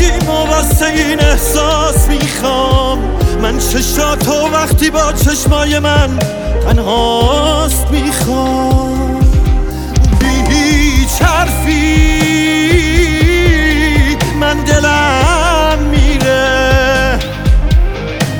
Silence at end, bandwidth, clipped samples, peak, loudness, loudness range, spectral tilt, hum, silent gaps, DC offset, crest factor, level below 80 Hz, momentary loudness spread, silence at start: 0 s; over 20 kHz; under 0.1%; 0 dBFS; -11 LUFS; 2 LU; -4.5 dB/octave; none; none; under 0.1%; 10 dB; -14 dBFS; 4 LU; 0 s